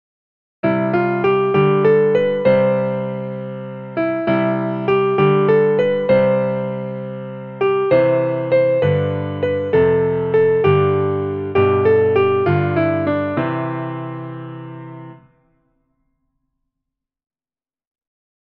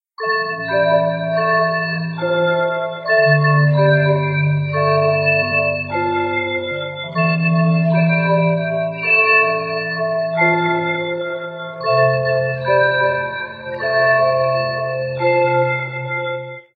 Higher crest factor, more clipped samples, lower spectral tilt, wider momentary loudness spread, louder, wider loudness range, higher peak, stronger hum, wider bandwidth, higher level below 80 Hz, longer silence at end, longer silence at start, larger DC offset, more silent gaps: about the same, 16 dB vs 14 dB; neither; about the same, -10 dB/octave vs -10.5 dB/octave; first, 14 LU vs 9 LU; about the same, -17 LUFS vs -17 LUFS; first, 8 LU vs 3 LU; about the same, -2 dBFS vs -2 dBFS; neither; about the same, 5.2 kHz vs 4.8 kHz; first, -54 dBFS vs -60 dBFS; first, 3.3 s vs 0.15 s; first, 0.65 s vs 0.2 s; neither; neither